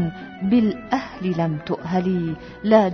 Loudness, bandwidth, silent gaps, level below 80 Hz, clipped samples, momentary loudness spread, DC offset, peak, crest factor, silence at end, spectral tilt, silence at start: -22 LUFS; 6.4 kHz; none; -50 dBFS; under 0.1%; 10 LU; under 0.1%; -2 dBFS; 18 dB; 0 s; -8.5 dB/octave; 0 s